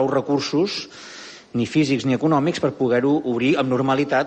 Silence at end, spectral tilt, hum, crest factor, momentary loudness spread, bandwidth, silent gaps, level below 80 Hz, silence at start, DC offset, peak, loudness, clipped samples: 0 s; -6 dB/octave; none; 14 dB; 11 LU; 8.8 kHz; none; -60 dBFS; 0 s; under 0.1%; -6 dBFS; -21 LUFS; under 0.1%